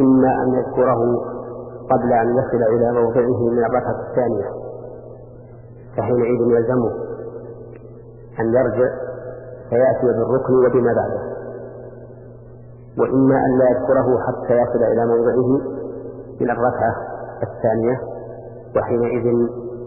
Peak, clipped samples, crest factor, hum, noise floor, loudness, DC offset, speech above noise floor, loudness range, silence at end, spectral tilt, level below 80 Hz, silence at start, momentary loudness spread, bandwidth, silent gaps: -4 dBFS; under 0.1%; 14 dB; none; -39 dBFS; -18 LUFS; under 0.1%; 22 dB; 5 LU; 0 s; -14.5 dB/octave; -48 dBFS; 0 s; 18 LU; 2.9 kHz; none